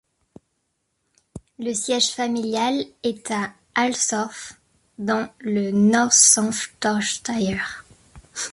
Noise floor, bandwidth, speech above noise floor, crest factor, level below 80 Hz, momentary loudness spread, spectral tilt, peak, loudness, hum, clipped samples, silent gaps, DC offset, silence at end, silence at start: -73 dBFS; 11.5 kHz; 52 dB; 22 dB; -58 dBFS; 17 LU; -2.5 dB/octave; 0 dBFS; -21 LUFS; none; under 0.1%; none; under 0.1%; 0 s; 1.35 s